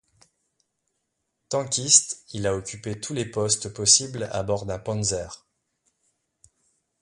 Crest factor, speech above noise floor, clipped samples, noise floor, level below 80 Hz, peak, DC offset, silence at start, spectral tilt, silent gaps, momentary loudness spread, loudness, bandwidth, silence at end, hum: 26 dB; 53 dB; under 0.1%; -78 dBFS; -54 dBFS; -2 dBFS; under 0.1%; 1.5 s; -2.5 dB/octave; none; 15 LU; -23 LUFS; 11.5 kHz; 1.65 s; none